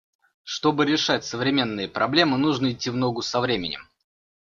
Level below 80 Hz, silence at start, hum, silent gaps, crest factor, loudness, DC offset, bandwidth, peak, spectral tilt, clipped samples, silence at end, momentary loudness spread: -58 dBFS; 0.45 s; none; none; 20 dB; -23 LUFS; under 0.1%; 7.4 kHz; -4 dBFS; -4.5 dB/octave; under 0.1%; 0.55 s; 7 LU